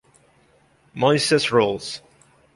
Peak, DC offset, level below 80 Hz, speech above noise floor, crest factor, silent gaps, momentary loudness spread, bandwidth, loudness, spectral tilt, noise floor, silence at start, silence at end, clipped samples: -4 dBFS; under 0.1%; -60 dBFS; 39 dB; 18 dB; none; 18 LU; 11.5 kHz; -20 LUFS; -4 dB/octave; -58 dBFS; 0.95 s; 0.55 s; under 0.1%